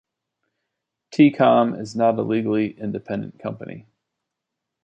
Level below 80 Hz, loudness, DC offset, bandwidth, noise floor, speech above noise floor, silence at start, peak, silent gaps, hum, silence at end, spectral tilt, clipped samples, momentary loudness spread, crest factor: -64 dBFS; -20 LUFS; under 0.1%; 8.4 kHz; -83 dBFS; 63 dB; 1.1 s; -4 dBFS; none; none; 1.05 s; -7.5 dB/octave; under 0.1%; 16 LU; 20 dB